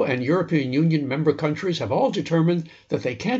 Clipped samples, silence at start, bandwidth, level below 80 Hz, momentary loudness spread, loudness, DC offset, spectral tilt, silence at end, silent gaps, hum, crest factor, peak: under 0.1%; 0 s; 7.8 kHz; -62 dBFS; 6 LU; -23 LUFS; under 0.1%; -7 dB/octave; 0 s; none; none; 16 dB; -6 dBFS